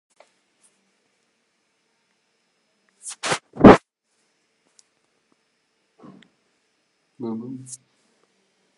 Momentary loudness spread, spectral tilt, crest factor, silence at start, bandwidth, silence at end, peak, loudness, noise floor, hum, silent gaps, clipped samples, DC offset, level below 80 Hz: 27 LU; -6 dB/octave; 24 dB; 3.05 s; 11.5 kHz; 1.2 s; 0 dBFS; -17 LUFS; -71 dBFS; none; none; under 0.1%; under 0.1%; -46 dBFS